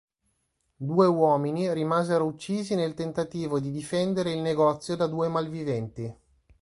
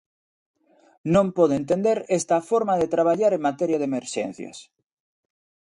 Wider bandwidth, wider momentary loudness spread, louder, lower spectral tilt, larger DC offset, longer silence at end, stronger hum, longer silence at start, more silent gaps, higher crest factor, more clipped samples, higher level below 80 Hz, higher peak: about the same, 11.5 kHz vs 11.5 kHz; about the same, 9 LU vs 10 LU; second, -27 LUFS vs -22 LUFS; about the same, -7 dB/octave vs -6 dB/octave; neither; second, 0.45 s vs 1.05 s; neither; second, 0.8 s vs 1.05 s; neither; about the same, 20 dB vs 18 dB; neither; about the same, -62 dBFS vs -60 dBFS; about the same, -8 dBFS vs -6 dBFS